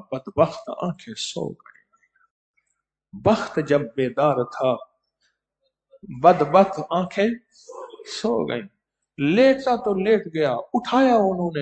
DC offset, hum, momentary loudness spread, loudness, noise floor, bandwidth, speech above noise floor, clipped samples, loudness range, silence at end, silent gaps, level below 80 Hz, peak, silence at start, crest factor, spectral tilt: under 0.1%; none; 14 LU; -21 LUFS; -77 dBFS; 9 kHz; 56 dB; under 0.1%; 6 LU; 0 s; 2.30-2.54 s; -58 dBFS; 0 dBFS; 0.1 s; 22 dB; -6 dB/octave